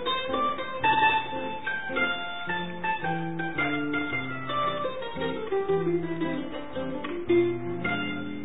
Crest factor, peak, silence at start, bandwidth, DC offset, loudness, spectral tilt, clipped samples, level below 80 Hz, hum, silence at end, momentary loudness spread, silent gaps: 18 dB; -12 dBFS; 0 s; 4 kHz; 1%; -28 LUFS; -9.5 dB/octave; under 0.1%; -56 dBFS; none; 0 s; 8 LU; none